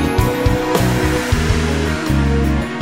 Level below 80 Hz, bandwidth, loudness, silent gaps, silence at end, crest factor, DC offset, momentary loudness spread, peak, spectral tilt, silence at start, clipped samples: -22 dBFS; 16.5 kHz; -17 LUFS; none; 0 s; 16 dB; 0.5%; 2 LU; 0 dBFS; -6 dB/octave; 0 s; under 0.1%